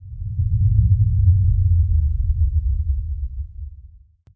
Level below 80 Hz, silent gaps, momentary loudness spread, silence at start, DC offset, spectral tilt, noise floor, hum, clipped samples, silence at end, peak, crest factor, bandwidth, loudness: -22 dBFS; none; 15 LU; 0 s; under 0.1%; -13.5 dB/octave; -47 dBFS; none; under 0.1%; 0.55 s; -4 dBFS; 14 dB; 0.4 kHz; -20 LUFS